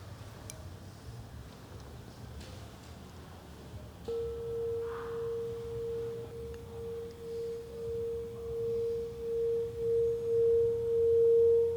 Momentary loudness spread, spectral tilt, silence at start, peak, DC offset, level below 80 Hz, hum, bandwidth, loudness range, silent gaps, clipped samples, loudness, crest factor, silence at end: 21 LU; -6.5 dB/octave; 0 s; -20 dBFS; under 0.1%; -56 dBFS; none; 19.5 kHz; 17 LU; none; under 0.1%; -33 LUFS; 14 dB; 0 s